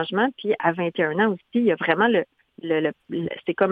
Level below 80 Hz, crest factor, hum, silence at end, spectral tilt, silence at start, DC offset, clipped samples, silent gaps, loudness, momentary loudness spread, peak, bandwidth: -66 dBFS; 20 dB; none; 0 s; -8.5 dB/octave; 0 s; under 0.1%; under 0.1%; none; -23 LUFS; 9 LU; -4 dBFS; 4.9 kHz